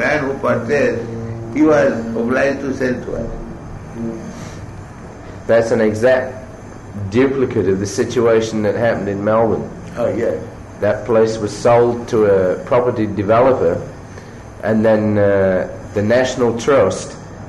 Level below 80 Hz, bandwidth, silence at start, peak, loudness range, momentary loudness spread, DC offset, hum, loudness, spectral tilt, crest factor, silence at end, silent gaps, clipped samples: -40 dBFS; 12 kHz; 0 s; -4 dBFS; 4 LU; 18 LU; under 0.1%; none; -16 LUFS; -6.5 dB/octave; 14 dB; 0 s; none; under 0.1%